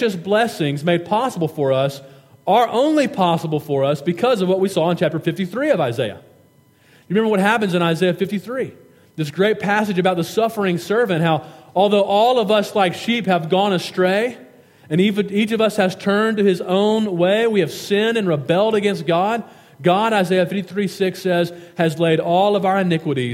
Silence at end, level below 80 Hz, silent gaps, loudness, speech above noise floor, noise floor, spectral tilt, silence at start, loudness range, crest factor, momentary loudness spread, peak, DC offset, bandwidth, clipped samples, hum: 0 s; -68 dBFS; none; -18 LUFS; 35 dB; -53 dBFS; -6 dB/octave; 0 s; 2 LU; 18 dB; 7 LU; 0 dBFS; under 0.1%; 16.5 kHz; under 0.1%; none